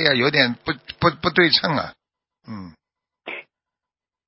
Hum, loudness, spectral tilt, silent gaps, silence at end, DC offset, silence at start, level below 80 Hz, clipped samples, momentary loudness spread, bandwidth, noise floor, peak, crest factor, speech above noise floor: none; -19 LUFS; -8 dB/octave; none; 0.85 s; under 0.1%; 0 s; -52 dBFS; under 0.1%; 21 LU; 5.8 kHz; -89 dBFS; -2 dBFS; 22 dB; 69 dB